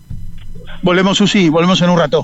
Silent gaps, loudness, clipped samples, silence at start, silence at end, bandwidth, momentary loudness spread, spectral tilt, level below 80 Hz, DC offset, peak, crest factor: none; -12 LUFS; under 0.1%; 0.1 s; 0 s; 8.2 kHz; 15 LU; -5.5 dB/octave; -32 dBFS; under 0.1%; -2 dBFS; 10 dB